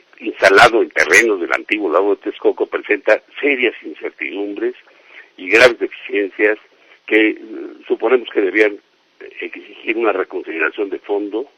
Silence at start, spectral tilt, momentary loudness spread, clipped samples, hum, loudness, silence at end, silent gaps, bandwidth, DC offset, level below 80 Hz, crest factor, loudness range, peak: 0.2 s; -3 dB/octave; 18 LU; under 0.1%; none; -15 LUFS; 0.15 s; none; 16 kHz; under 0.1%; -54 dBFS; 16 dB; 5 LU; 0 dBFS